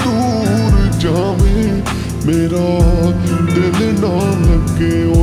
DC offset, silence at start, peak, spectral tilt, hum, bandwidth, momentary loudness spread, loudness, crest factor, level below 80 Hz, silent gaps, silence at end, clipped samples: under 0.1%; 0 s; 0 dBFS; -7 dB/octave; none; over 20 kHz; 3 LU; -14 LUFS; 12 dB; -20 dBFS; none; 0 s; under 0.1%